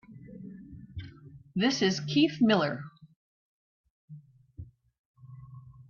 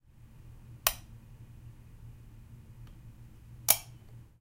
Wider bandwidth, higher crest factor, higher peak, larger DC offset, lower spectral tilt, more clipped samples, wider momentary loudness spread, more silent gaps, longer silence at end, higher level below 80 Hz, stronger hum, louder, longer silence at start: second, 7.2 kHz vs 16 kHz; second, 20 dB vs 36 dB; second, -12 dBFS vs -4 dBFS; neither; first, -5 dB/octave vs -1 dB/octave; neither; about the same, 25 LU vs 27 LU; first, 3.16-3.84 s, 3.90-4.08 s, 4.99-5.14 s vs none; about the same, 0.05 s vs 0.05 s; second, -62 dBFS vs -54 dBFS; neither; about the same, -27 LUFS vs -29 LUFS; about the same, 0.1 s vs 0.05 s